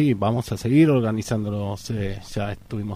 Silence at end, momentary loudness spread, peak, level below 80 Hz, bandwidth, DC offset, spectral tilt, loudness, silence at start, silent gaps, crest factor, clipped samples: 0 s; 12 LU; -6 dBFS; -44 dBFS; 15.5 kHz; under 0.1%; -7 dB/octave; -23 LUFS; 0 s; none; 16 dB; under 0.1%